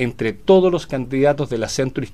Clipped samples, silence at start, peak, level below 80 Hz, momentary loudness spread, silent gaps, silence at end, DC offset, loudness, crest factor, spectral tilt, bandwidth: under 0.1%; 0 s; -2 dBFS; -44 dBFS; 9 LU; none; 0.05 s; 1%; -18 LUFS; 16 dB; -6 dB/octave; 12.5 kHz